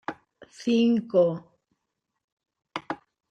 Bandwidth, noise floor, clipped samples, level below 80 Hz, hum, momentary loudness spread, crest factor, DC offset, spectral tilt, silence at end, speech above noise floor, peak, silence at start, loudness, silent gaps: 8.6 kHz; -82 dBFS; under 0.1%; -74 dBFS; none; 17 LU; 18 dB; under 0.1%; -6.5 dB/octave; 0.35 s; 59 dB; -10 dBFS; 0.1 s; -25 LUFS; 2.24-2.37 s